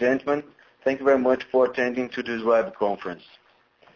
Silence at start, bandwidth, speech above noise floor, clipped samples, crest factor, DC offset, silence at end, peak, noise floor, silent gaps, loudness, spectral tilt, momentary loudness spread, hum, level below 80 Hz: 0 s; 7 kHz; 35 dB; under 0.1%; 16 dB; under 0.1%; 0.8 s; -8 dBFS; -58 dBFS; none; -24 LUFS; -6 dB/octave; 8 LU; none; -64 dBFS